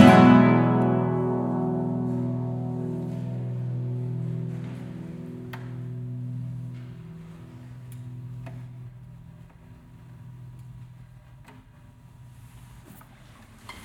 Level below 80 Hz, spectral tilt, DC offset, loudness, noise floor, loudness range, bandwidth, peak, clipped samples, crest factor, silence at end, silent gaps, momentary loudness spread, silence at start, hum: -56 dBFS; -8 dB/octave; under 0.1%; -25 LUFS; -50 dBFS; 21 LU; 12.5 kHz; 0 dBFS; under 0.1%; 26 dB; 0 s; none; 23 LU; 0 s; none